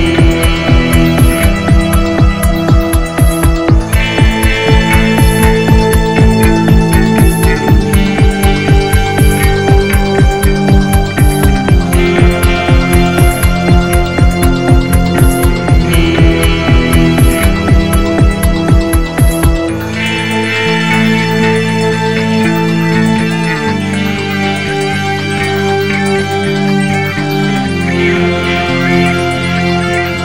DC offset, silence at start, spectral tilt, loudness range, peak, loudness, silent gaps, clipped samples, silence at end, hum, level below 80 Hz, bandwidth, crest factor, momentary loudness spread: 3%; 0 s; -6 dB/octave; 3 LU; 0 dBFS; -10 LUFS; none; 0.4%; 0 s; none; -14 dBFS; 16.5 kHz; 10 dB; 4 LU